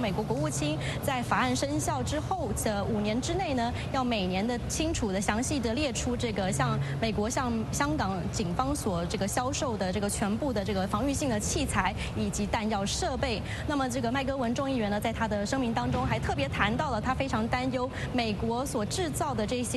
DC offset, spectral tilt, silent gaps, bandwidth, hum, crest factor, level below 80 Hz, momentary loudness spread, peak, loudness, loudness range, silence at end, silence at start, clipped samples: under 0.1%; -4.5 dB/octave; none; 12.5 kHz; none; 18 dB; -42 dBFS; 3 LU; -10 dBFS; -30 LUFS; 1 LU; 0 s; 0 s; under 0.1%